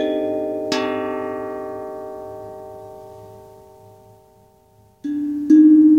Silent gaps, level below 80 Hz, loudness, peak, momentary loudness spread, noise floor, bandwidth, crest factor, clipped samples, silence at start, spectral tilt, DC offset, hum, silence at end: none; -60 dBFS; -19 LUFS; -4 dBFS; 26 LU; -53 dBFS; 7.6 kHz; 16 dB; under 0.1%; 0 s; -5.5 dB/octave; under 0.1%; none; 0 s